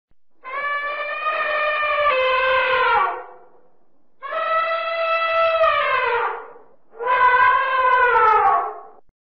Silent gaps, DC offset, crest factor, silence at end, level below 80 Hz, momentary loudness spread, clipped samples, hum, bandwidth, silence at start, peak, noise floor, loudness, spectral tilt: none; 0.4%; 14 dB; 0.4 s; -56 dBFS; 13 LU; under 0.1%; none; 6 kHz; 0.45 s; -6 dBFS; -65 dBFS; -18 LUFS; 2.5 dB/octave